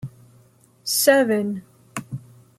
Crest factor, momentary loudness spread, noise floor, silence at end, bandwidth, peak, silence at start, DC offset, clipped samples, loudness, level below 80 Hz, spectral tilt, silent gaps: 22 dB; 21 LU; -55 dBFS; 0.4 s; 15.5 kHz; -2 dBFS; 0.05 s; under 0.1%; under 0.1%; -19 LUFS; -66 dBFS; -3.5 dB/octave; none